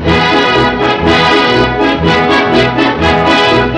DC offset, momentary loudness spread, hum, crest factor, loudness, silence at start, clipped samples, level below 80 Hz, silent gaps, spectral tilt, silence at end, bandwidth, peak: under 0.1%; 3 LU; none; 8 dB; -9 LUFS; 0 s; under 0.1%; -28 dBFS; none; -5.5 dB/octave; 0 s; 11 kHz; -2 dBFS